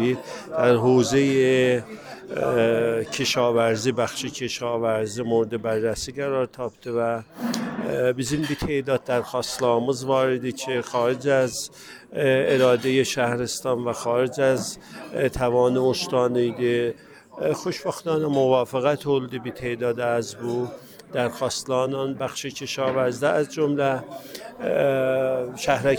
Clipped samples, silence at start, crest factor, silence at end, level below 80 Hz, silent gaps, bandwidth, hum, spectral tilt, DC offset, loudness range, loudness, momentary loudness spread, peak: under 0.1%; 0 s; 18 dB; 0 s; -52 dBFS; none; over 20 kHz; none; -5 dB/octave; under 0.1%; 4 LU; -23 LUFS; 10 LU; -6 dBFS